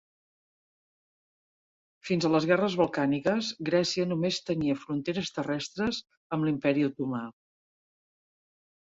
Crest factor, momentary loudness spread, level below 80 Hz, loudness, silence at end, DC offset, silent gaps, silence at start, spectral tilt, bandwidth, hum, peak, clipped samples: 20 dB; 8 LU; -66 dBFS; -29 LUFS; 1.6 s; under 0.1%; 6.17-6.30 s; 2.05 s; -5.5 dB/octave; 7.8 kHz; none; -10 dBFS; under 0.1%